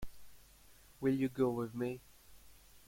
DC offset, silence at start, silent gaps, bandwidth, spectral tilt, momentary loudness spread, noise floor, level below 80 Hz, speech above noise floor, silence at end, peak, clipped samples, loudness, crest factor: under 0.1%; 0 s; none; 16.5 kHz; -7.5 dB/octave; 13 LU; -62 dBFS; -60 dBFS; 27 dB; 0.1 s; -20 dBFS; under 0.1%; -37 LUFS; 18 dB